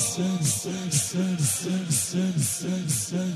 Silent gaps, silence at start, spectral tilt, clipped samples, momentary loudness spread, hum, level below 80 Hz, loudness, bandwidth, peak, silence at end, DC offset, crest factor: none; 0 s; -4 dB/octave; under 0.1%; 2 LU; none; -60 dBFS; -25 LUFS; 15 kHz; -10 dBFS; 0 s; under 0.1%; 16 dB